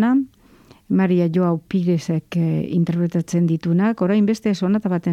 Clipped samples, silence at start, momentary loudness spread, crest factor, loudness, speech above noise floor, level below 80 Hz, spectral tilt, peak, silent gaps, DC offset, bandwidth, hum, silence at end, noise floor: under 0.1%; 0 s; 4 LU; 10 dB; -20 LUFS; 31 dB; -58 dBFS; -8 dB/octave; -8 dBFS; none; under 0.1%; 9.2 kHz; none; 0 s; -50 dBFS